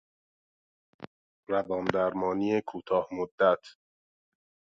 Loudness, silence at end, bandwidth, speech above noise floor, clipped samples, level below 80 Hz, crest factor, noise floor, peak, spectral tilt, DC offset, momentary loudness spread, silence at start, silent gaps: -29 LUFS; 1 s; 7.6 kHz; over 62 dB; under 0.1%; -66 dBFS; 26 dB; under -90 dBFS; -6 dBFS; -7 dB/octave; under 0.1%; 24 LU; 1 s; 1.07-1.43 s, 3.31-3.38 s